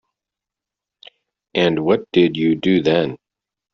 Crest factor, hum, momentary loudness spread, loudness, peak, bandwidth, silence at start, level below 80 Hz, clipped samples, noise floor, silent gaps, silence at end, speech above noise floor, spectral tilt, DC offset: 18 dB; none; 5 LU; -18 LUFS; -2 dBFS; 6.8 kHz; 1.55 s; -58 dBFS; under 0.1%; -86 dBFS; none; 0.55 s; 70 dB; -7 dB/octave; under 0.1%